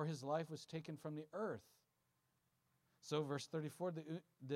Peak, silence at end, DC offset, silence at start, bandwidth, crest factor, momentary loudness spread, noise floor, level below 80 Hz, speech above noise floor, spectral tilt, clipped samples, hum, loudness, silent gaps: -28 dBFS; 0 s; under 0.1%; 0 s; 15.5 kHz; 20 dB; 9 LU; -84 dBFS; under -90 dBFS; 38 dB; -6 dB/octave; under 0.1%; none; -47 LUFS; none